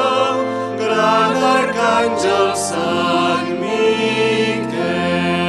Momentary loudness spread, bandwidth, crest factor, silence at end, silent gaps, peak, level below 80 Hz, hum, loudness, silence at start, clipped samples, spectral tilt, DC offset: 5 LU; 13 kHz; 14 dB; 0 s; none; -2 dBFS; -54 dBFS; none; -16 LUFS; 0 s; under 0.1%; -4.5 dB/octave; under 0.1%